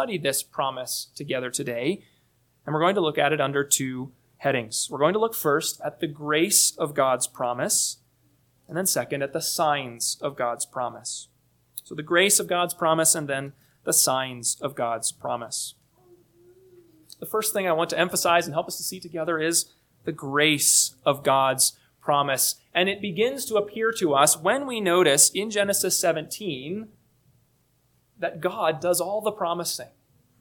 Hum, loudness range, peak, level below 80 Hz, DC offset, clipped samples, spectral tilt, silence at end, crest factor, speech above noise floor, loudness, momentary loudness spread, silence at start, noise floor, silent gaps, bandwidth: none; 7 LU; -2 dBFS; -70 dBFS; under 0.1%; under 0.1%; -2.5 dB/octave; 0.55 s; 22 dB; 42 dB; -23 LUFS; 13 LU; 0 s; -66 dBFS; none; 19 kHz